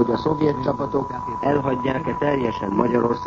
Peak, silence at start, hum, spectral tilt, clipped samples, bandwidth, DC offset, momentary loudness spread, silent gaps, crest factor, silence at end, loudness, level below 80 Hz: -4 dBFS; 0 s; none; -8 dB/octave; under 0.1%; 7.4 kHz; under 0.1%; 4 LU; none; 18 dB; 0 s; -22 LUFS; -46 dBFS